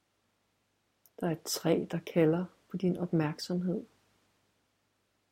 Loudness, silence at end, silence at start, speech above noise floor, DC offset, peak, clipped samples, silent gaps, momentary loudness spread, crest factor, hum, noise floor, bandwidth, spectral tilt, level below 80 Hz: -32 LUFS; 1.45 s; 1.2 s; 45 dB; under 0.1%; -14 dBFS; under 0.1%; none; 8 LU; 20 dB; none; -77 dBFS; 16.5 kHz; -6 dB/octave; -72 dBFS